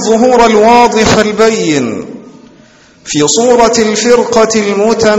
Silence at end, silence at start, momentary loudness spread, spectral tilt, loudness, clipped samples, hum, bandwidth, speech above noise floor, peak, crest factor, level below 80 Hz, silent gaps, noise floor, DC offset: 0 s; 0 s; 8 LU; -3.5 dB/octave; -8 LUFS; 1%; none; 9.8 kHz; 33 dB; 0 dBFS; 8 dB; -36 dBFS; none; -41 dBFS; under 0.1%